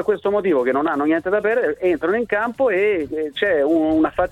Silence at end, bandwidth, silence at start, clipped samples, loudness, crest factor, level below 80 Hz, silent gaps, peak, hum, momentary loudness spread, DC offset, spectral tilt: 0 s; 9.4 kHz; 0 s; under 0.1%; -19 LUFS; 14 dB; -50 dBFS; none; -4 dBFS; none; 3 LU; under 0.1%; -7 dB/octave